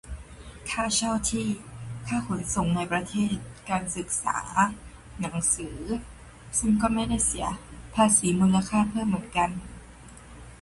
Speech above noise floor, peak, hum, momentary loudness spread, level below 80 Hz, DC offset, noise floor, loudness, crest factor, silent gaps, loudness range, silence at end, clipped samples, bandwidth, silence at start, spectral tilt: 21 dB; -8 dBFS; none; 20 LU; -46 dBFS; under 0.1%; -47 dBFS; -26 LUFS; 20 dB; none; 4 LU; 0.05 s; under 0.1%; 11.5 kHz; 0.05 s; -4 dB/octave